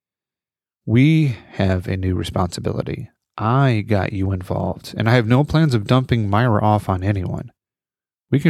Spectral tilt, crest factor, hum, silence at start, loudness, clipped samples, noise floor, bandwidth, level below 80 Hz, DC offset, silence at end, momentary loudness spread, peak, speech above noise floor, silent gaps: -7.5 dB/octave; 18 dB; none; 0.85 s; -19 LUFS; under 0.1%; under -90 dBFS; 13 kHz; -44 dBFS; under 0.1%; 0 s; 11 LU; -2 dBFS; over 72 dB; none